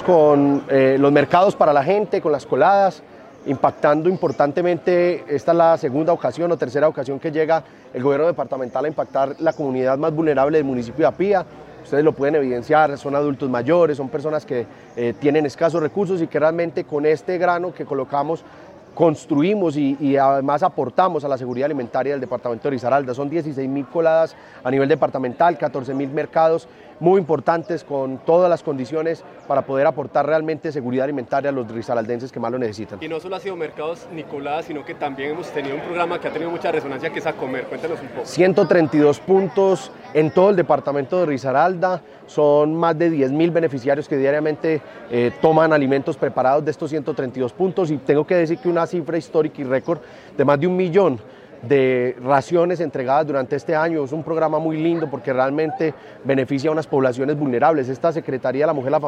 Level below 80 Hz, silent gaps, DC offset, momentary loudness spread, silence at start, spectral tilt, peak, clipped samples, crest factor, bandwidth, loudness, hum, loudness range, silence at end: -62 dBFS; none; under 0.1%; 10 LU; 0 s; -7.5 dB/octave; -2 dBFS; under 0.1%; 18 dB; 10 kHz; -20 LUFS; none; 5 LU; 0 s